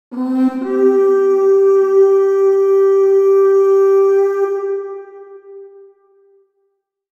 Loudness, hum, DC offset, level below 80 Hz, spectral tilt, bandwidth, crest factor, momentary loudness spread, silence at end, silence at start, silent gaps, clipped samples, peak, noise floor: -13 LUFS; none; under 0.1%; -74 dBFS; -6 dB/octave; 6.8 kHz; 10 dB; 9 LU; 1.5 s; 0.1 s; none; under 0.1%; -4 dBFS; -68 dBFS